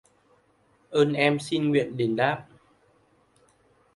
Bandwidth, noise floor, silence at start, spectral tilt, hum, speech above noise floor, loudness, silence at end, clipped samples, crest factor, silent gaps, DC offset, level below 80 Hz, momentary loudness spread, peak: 11.5 kHz; -64 dBFS; 0.9 s; -6 dB/octave; none; 40 dB; -25 LUFS; 1.55 s; under 0.1%; 20 dB; none; under 0.1%; -68 dBFS; 6 LU; -8 dBFS